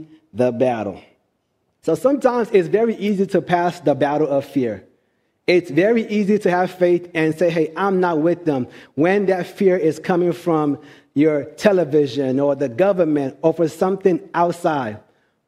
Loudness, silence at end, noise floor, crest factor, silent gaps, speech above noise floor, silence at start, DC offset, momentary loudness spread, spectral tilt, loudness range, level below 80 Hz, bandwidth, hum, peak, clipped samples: -19 LUFS; 0.5 s; -69 dBFS; 18 dB; none; 51 dB; 0 s; under 0.1%; 7 LU; -7 dB/octave; 1 LU; -64 dBFS; 14.5 kHz; none; 0 dBFS; under 0.1%